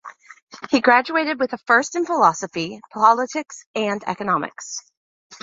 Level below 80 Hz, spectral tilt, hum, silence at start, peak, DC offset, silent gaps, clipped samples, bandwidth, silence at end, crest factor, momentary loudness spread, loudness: -66 dBFS; -3.5 dB/octave; none; 0.05 s; -2 dBFS; under 0.1%; 0.42-0.47 s, 3.66-3.74 s, 4.97-5.30 s; under 0.1%; 7.8 kHz; 0.1 s; 20 dB; 14 LU; -20 LUFS